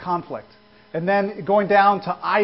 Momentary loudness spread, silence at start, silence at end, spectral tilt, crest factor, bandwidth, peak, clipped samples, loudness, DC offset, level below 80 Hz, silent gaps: 17 LU; 0 s; 0 s; -10.5 dB/octave; 18 dB; 5.8 kHz; -4 dBFS; under 0.1%; -20 LUFS; under 0.1%; -62 dBFS; none